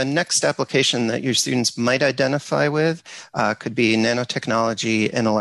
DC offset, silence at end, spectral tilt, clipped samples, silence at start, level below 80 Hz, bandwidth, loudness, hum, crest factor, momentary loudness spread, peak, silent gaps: under 0.1%; 0 s; -3.5 dB/octave; under 0.1%; 0 s; -60 dBFS; 12.5 kHz; -20 LUFS; none; 14 dB; 5 LU; -6 dBFS; none